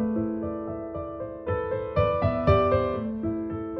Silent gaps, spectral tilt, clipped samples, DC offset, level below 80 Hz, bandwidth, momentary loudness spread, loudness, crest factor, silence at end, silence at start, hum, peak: none; -10.5 dB/octave; under 0.1%; under 0.1%; -42 dBFS; 6 kHz; 12 LU; -27 LUFS; 18 dB; 0 s; 0 s; none; -8 dBFS